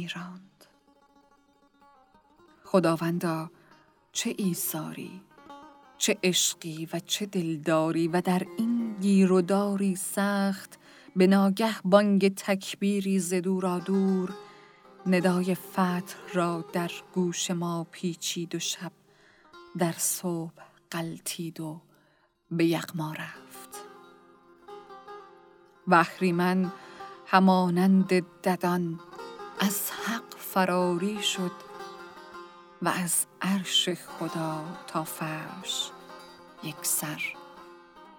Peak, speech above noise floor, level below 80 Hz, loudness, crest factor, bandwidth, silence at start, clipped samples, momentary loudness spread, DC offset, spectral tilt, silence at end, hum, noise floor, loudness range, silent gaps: -6 dBFS; 39 dB; -76 dBFS; -27 LUFS; 24 dB; 20 kHz; 0 s; under 0.1%; 21 LU; under 0.1%; -4.5 dB/octave; 0.15 s; none; -66 dBFS; 8 LU; none